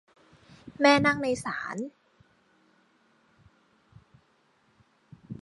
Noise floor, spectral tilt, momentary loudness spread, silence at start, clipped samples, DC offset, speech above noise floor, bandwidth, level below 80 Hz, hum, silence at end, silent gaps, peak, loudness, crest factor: -67 dBFS; -4.5 dB/octave; 23 LU; 0.65 s; under 0.1%; under 0.1%; 42 dB; 11.5 kHz; -64 dBFS; none; 0 s; none; -8 dBFS; -25 LUFS; 24 dB